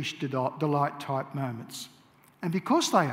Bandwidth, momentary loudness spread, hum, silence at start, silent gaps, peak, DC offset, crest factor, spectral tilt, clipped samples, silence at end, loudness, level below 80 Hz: 16 kHz; 15 LU; none; 0 s; none; -8 dBFS; under 0.1%; 20 dB; -5 dB/octave; under 0.1%; 0 s; -29 LUFS; -76 dBFS